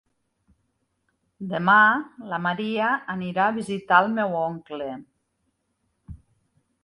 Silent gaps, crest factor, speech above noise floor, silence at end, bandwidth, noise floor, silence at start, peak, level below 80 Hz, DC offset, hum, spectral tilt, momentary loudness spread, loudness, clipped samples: none; 24 dB; 51 dB; 0.65 s; 11.5 kHz; -74 dBFS; 1.4 s; -2 dBFS; -60 dBFS; under 0.1%; none; -6 dB/octave; 17 LU; -22 LUFS; under 0.1%